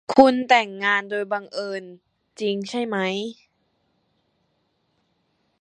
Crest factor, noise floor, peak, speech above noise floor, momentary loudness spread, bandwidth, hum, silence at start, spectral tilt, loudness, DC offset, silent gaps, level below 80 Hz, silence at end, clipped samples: 24 dB; -70 dBFS; 0 dBFS; 49 dB; 14 LU; 10 kHz; none; 0.1 s; -4.5 dB/octave; -22 LUFS; under 0.1%; none; -66 dBFS; 2.3 s; under 0.1%